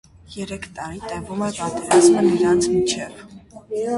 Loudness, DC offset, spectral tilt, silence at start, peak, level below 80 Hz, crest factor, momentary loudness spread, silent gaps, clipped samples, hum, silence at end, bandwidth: -19 LUFS; under 0.1%; -4.5 dB/octave; 0.3 s; -2 dBFS; -50 dBFS; 18 dB; 18 LU; none; under 0.1%; none; 0 s; 11.5 kHz